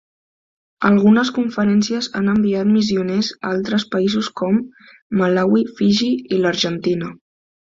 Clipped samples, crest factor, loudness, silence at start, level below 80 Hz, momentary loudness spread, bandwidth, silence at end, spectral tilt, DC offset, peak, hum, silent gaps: under 0.1%; 16 dB; -18 LUFS; 0.8 s; -56 dBFS; 7 LU; 7.6 kHz; 0.6 s; -6 dB/octave; under 0.1%; -2 dBFS; none; 5.02-5.10 s